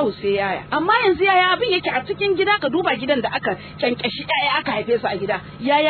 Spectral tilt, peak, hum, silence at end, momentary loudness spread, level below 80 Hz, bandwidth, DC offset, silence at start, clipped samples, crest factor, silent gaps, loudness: -7.5 dB/octave; -4 dBFS; none; 0 s; 8 LU; -54 dBFS; 4.6 kHz; under 0.1%; 0 s; under 0.1%; 14 dB; none; -19 LUFS